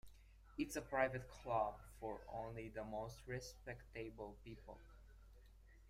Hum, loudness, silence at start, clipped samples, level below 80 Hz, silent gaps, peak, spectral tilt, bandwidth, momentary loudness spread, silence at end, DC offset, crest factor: none; -47 LUFS; 0.05 s; under 0.1%; -62 dBFS; none; -24 dBFS; -5.5 dB/octave; 15.5 kHz; 24 LU; 0 s; under 0.1%; 24 dB